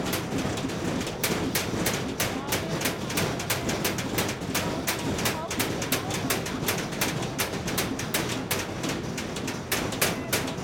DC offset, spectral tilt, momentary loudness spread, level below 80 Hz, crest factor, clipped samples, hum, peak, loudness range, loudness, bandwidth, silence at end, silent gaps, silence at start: under 0.1%; -3.5 dB/octave; 3 LU; -48 dBFS; 20 dB; under 0.1%; none; -8 dBFS; 1 LU; -28 LUFS; 19 kHz; 0 s; none; 0 s